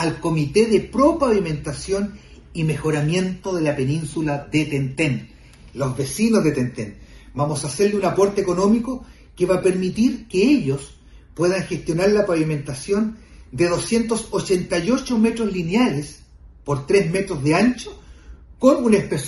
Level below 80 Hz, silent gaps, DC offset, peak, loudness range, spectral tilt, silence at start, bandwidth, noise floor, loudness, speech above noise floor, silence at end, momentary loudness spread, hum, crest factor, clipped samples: -44 dBFS; none; under 0.1%; -2 dBFS; 3 LU; -6 dB/octave; 0 s; 12 kHz; -42 dBFS; -20 LUFS; 23 dB; 0 s; 11 LU; none; 18 dB; under 0.1%